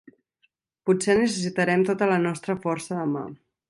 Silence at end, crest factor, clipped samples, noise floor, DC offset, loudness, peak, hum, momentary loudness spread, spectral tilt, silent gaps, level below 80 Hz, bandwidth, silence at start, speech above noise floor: 0.35 s; 18 dB; under 0.1%; -70 dBFS; under 0.1%; -24 LUFS; -8 dBFS; none; 9 LU; -5.5 dB/octave; none; -64 dBFS; 11.5 kHz; 0.85 s; 47 dB